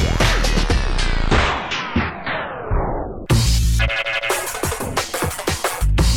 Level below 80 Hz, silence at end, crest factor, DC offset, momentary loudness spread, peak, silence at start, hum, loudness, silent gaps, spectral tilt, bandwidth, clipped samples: -22 dBFS; 0 s; 14 dB; 0.8%; 6 LU; -4 dBFS; 0 s; none; -20 LUFS; none; -4 dB/octave; 19 kHz; under 0.1%